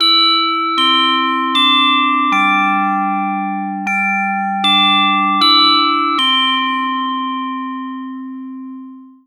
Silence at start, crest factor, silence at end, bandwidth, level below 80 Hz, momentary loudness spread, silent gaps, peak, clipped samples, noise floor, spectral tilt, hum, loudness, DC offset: 0 s; 14 dB; 0.2 s; 18 kHz; -74 dBFS; 16 LU; none; 0 dBFS; under 0.1%; -35 dBFS; -3.5 dB/octave; none; -13 LUFS; under 0.1%